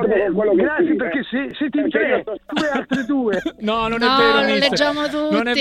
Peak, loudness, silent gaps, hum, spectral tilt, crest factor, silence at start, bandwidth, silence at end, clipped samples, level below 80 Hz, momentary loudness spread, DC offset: 0 dBFS; -18 LUFS; none; none; -5 dB/octave; 18 dB; 0 s; 12.5 kHz; 0 s; under 0.1%; -48 dBFS; 8 LU; under 0.1%